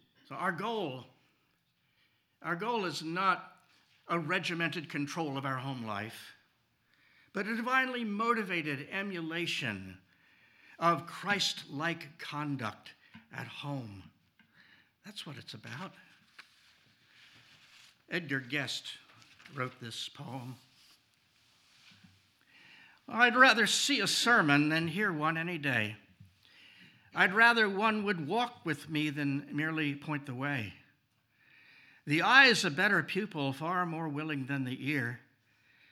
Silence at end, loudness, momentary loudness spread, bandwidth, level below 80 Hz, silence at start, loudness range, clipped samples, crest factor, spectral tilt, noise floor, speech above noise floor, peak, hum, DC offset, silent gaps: 0.75 s; -31 LUFS; 20 LU; 16.5 kHz; -88 dBFS; 0.3 s; 18 LU; under 0.1%; 26 dB; -4 dB/octave; -75 dBFS; 43 dB; -6 dBFS; none; under 0.1%; none